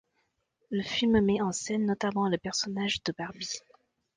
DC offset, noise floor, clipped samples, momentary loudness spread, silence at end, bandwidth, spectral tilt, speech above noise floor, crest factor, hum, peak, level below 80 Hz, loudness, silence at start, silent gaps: under 0.1%; -77 dBFS; under 0.1%; 12 LU; 0.6 s; 9.8 kHz; -4.5 dB/octave; 47 dB; 18 dB; none; -14 dBFS; -58 dBFS; -30 LUFS; 0.7 s; none